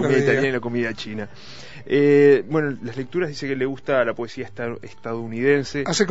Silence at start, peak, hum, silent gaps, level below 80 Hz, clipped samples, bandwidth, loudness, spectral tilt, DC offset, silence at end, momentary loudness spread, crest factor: 0 s; -4 dBFS; none; none; -58 dBFS; under 0.1%; 8 kHz; -21 LUFS; -5.5 dB/octave; 1%; 0 s; 16 LU; 18 dB